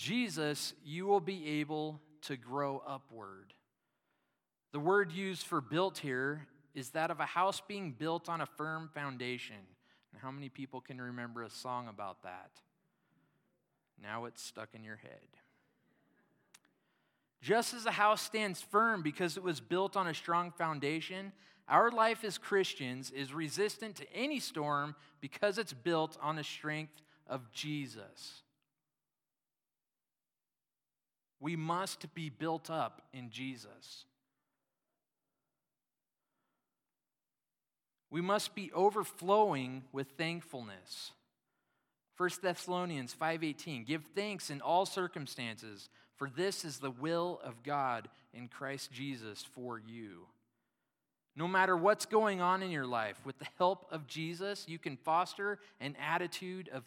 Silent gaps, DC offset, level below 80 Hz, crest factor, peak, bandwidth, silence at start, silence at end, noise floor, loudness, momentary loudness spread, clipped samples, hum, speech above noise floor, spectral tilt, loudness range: none; under 0.1%; under -90 dBFS; 24 dB; -14 dBFS; 17.5 kHz; 0 s; 0.05 s; under -90 dBFS; -37 LUFS; 17 LU; under 0.1%; none; over 53 dB; -4.5 dB/octave; 13 LU